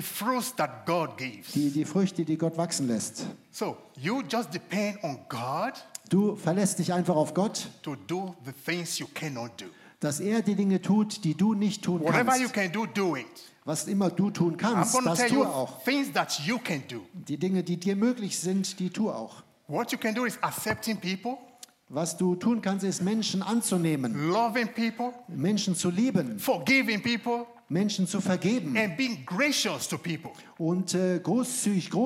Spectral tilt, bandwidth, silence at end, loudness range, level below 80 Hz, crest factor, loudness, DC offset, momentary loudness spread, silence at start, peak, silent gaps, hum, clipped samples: -4.5 dB/octave; 16 kHz; 0 s; 4 LU; -76 dBFS; 20 dB; -28 LUFS; under 0.1%; 10 LU; 0 s; -10 dBFS; none; none; under 0.1%